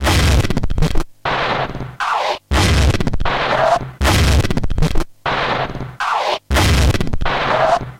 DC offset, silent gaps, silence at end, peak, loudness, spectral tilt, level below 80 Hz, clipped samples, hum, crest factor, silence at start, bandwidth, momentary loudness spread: under 0.1%; none; 0.05 s; 0 dBFS; -17 LUFS; -5 dB/octave; -20 dBFS; under 0.1%; none; 14 dB; 0 s; 16.5 kHz; 7 LU